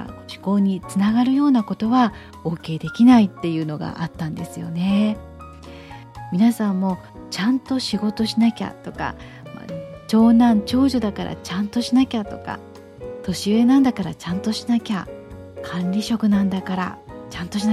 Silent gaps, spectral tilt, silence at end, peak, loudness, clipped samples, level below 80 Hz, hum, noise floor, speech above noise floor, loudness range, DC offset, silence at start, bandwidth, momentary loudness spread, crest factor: none; -6.5 dB/octave; 0 s; -4 dBFS; -20 LUFS; under 0.1%; -48 dBFS; none; -39 dBFS; 19 dB; 5 LU; under 0.1%; 0 s; 13.5 kHz; 19 LU; 16 dB